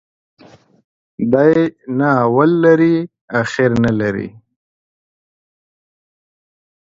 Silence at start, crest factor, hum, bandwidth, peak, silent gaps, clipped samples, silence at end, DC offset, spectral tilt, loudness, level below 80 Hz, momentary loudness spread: 1.2 s; 16 dB; none; 7.8 kHz; 0 dBFS; 3.21-3.28 s; under 0.1%; 2.55 s; under 0.1%; -8 dB/octave; -15 LUFS; -52 dBFS; 10 LU